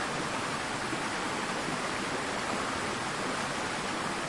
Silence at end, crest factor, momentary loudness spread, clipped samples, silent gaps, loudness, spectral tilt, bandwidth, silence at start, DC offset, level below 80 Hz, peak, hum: 0 s; 14 dB; 1 LU; under 0.1%; none; -32 LUFS; -3 dB/octave; 11.5 kHz; 0 s; under 0.1%; -58 dBFS; -20 dBFS; none